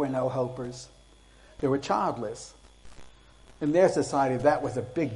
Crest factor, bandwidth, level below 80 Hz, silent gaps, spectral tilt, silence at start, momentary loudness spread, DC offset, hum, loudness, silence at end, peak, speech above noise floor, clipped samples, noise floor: 20 dB; 11.5 kHz; -56 dBFS; none; -6 dB/octave; 0 s; 18 LU; under 0.1%; none; -27 LUFS; 0 s; -8 dBFS; 28 dB; under 0.1%; -55 dBFS